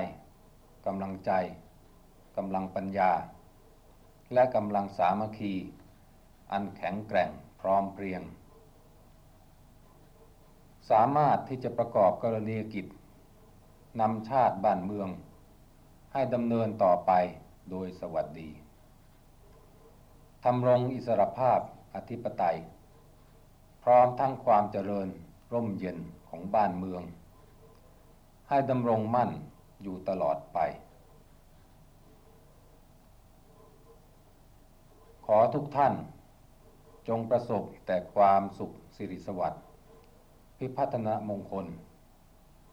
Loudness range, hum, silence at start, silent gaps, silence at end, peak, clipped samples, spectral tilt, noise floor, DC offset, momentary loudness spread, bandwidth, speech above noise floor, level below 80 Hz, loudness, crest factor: 7 LU; none; 0 s; none; 0.85 s; -12 dBFS; under 0.1%; -8.5 dB/octave; -58 dBFS; under 0.1%; 17 LU; 15.5 kHz; 29 dB; -60 dBFS; -30 LUFS; 20 dB